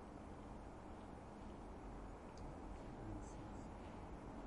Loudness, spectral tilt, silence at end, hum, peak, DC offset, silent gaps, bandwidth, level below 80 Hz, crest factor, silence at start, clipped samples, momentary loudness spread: -55 LUFS; -7 dB/octave; 0 s; none; -38 dBFS; under 0.1%; none; 11 kHz; -58 dBFS; 14 dB; 0 s; under 0.1%; 3 LU